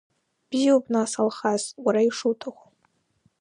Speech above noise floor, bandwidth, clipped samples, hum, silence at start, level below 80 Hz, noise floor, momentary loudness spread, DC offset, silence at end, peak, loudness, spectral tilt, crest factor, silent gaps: 46 dB; 11 kHz; under 0.1%; none; 0.5 s; -78 dBFS; -69 dBFS; 9 LU; under 0.1%; 0.9 s; -8 dBFS; -24 LUFS; -4 dB/octave; 18 dB; none